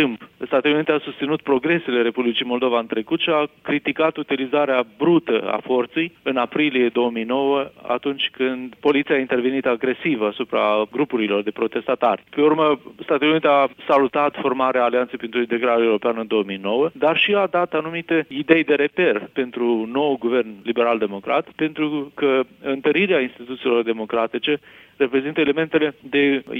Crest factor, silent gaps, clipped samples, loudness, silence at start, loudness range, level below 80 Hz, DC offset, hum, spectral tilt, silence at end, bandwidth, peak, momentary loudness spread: 20 dB; none; under 0.1%; -20 LUFS; 0 s; 2 LU; -66 dBFS; under 0.1%; none; -7.5 dB/octave; 0 s; 4.7 kHz; 0 dBFS; 6 LU